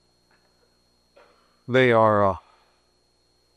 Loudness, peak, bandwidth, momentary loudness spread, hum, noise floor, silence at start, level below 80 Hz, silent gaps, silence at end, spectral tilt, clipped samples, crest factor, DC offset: -20 LUFS; -6 dBFS; 9.6 kHz; 9 LU; 60 Hz at -50 dBFS; -66 dBFS; 1.7 s; -62 dBFS; none; 1.15 s; -7.5 dB/octave; under 0.1%; 20 dB; under 0.1%